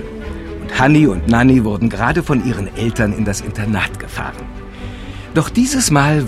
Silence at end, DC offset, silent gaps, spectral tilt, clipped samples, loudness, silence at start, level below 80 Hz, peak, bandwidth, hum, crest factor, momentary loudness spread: 0 s; under 0.1%; none; -5.5 dB/octave; under 0.1%; -15 LUFS; 0 s; -30 dBFS; 0 dBFS; 15 kHz; none; 16 dB; 18 LU